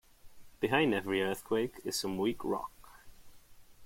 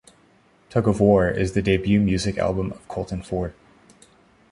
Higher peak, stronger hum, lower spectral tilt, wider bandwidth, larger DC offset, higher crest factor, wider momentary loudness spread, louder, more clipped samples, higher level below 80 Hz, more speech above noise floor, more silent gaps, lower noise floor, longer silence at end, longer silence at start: second, -14 dBFS vs -4 dBFS; neither; second, -4.5 dB/octave vs -7 dB/octave; first, 16.5 kHz vs 11.5 kHz; neither; about the same, 22 dB vs 18 dB; second, 8 LU vs 12 LU; second, -33 LUFS vs -22 LUFS; neither; second, -62 dBFS vs -40 dBFS; second, 23 dB vs 36 dB; neither; about the same, -55 dBFS vs -57 dBFS; second, 0 s vs 1 s; second, 0.25 s vs 0.7 s